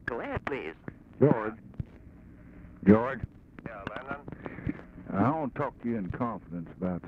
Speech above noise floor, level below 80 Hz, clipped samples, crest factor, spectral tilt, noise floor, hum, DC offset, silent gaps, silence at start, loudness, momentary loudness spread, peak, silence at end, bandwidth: 23 dB; -52 dBFS; under 0.1%; 24 dB; -10 dB/octave; -51 dBFS; none; under 0.1%; none; 0.05 s; -31 LUFS; 19 LU; -8 dBFS; 0 s; 5.2 kHz